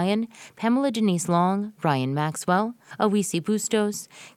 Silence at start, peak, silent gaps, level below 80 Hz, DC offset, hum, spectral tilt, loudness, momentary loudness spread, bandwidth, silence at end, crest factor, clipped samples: 0 s; -6 dBFS; none; -70 dBFS; under 0.1%; none; -5.5 dB/octave; -24 LUFS; 6 LU; 15.5 kHz; 0.1 s; 18 dB; under 0.1%